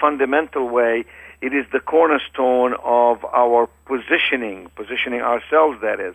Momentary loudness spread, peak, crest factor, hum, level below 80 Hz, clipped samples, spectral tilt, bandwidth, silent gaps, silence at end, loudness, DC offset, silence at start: 9 LU; -2 dBFS; 16 dB; none; -54 dBFS; under 0.1%; -5 dB/octave; 8.4 kHz; none; 0 s; -18 LUFS; under 0.1%; 0 s